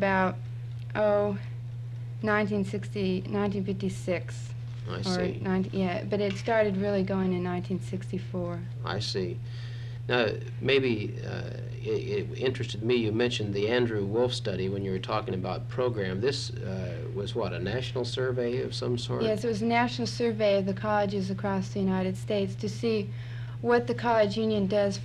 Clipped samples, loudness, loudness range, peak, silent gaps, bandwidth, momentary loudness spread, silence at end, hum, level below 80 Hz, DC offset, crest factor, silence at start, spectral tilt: under 0.1%; -29 LUFS; 3 LU; -10 dBFS; none; 11 kHz; 10 LU; 0 s; none; -54 dBFS; under 0.1%; 20 dB; 0 s; -6.5 dB/octave